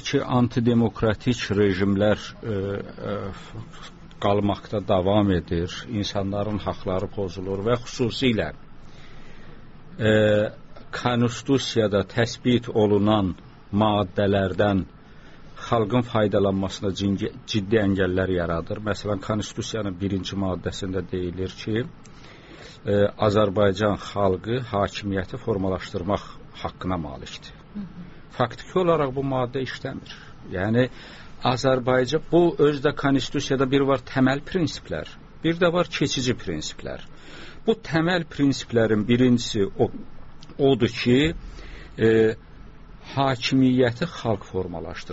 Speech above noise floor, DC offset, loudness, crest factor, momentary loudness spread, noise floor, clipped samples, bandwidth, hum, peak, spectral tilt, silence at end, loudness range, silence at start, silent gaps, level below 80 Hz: 21 dB; under 0.1%; -24 LUFS; 18 dB; 16 LU; -44 dBFS; under 0.1%; 8 kHz; none; -6 dBFS; -5.5 dB/octave; 0 s; 5 LU; 0 s; none; -44 dBFS